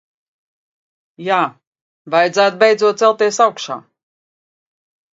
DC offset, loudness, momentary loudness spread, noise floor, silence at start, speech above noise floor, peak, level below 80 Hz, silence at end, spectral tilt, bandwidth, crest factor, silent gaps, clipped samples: under 0.1%; -15 LUFS; 14 LU; under -90 dBFS; 1.2 s; over 76 dB; 0 dBFS; -72 dBFS; 1.35 s; -3 dB/octave; 7.8 kHz; 18 dB; 1.67-1.72 s, 1.81-2.05 s; under 0.1%